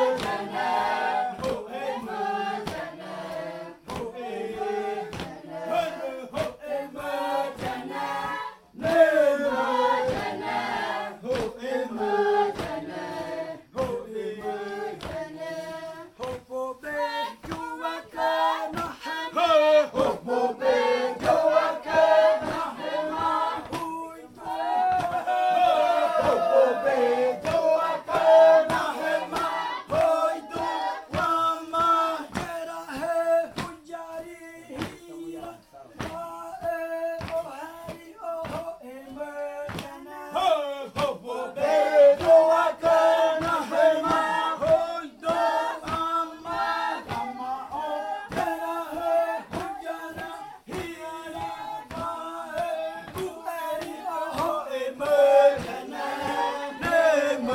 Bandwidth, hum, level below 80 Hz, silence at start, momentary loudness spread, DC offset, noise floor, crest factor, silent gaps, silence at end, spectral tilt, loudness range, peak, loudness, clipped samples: 16 kHz; none; -58 dBFS; 0 s; 15 LU; under 0.1%; -47 dBFS; 18 dB; none; 0 s; -4.5 dB/octave; 12 LU; -6 dBFS; -25 LUFS; under 0.1%